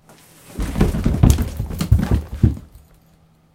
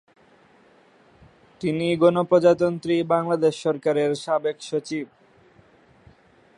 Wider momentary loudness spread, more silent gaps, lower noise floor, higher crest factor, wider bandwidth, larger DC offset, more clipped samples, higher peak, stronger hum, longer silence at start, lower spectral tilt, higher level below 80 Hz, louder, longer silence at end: about the same, 13 LU vs 12 LU; neither; about the same, -54 dBFS vs -56 dBFS; about the same, 20 dB vs 20 dB; first, 17 kHz vs 11 kHz; neither; neither; first, 0 dBFS vs -4 dBFS; neither; second, 0.5 s vs 1.6 s; about the same, -7 dB/octave vs -6.5 dB/octave; first, -24 dBFS vs -64 dBFS; first, -19 LUFS vs -22 LUFS; second, 0.75 s vs 1.55 s